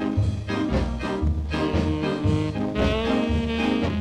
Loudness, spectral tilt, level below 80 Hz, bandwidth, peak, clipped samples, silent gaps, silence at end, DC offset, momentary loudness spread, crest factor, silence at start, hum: -24 LUFS; -7 dB/octave; -32 dBFS; 10 kHz; -8 dBFS; under 0.1%; none; 0 s; under 0.1%; 3 LU; 16 dB; 0 s; none